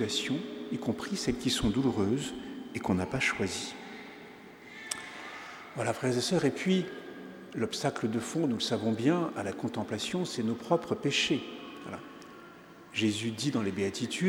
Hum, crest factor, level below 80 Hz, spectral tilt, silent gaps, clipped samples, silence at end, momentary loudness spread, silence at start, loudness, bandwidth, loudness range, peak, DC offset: none; 22 dB; -58 dBFS; -4.5 dB/octave; none; under 0.1%; 0 s; 17 LU; 0 s; -32 LUFS; 19 kHz; 4 LU; -12 dBFS; under 0.1%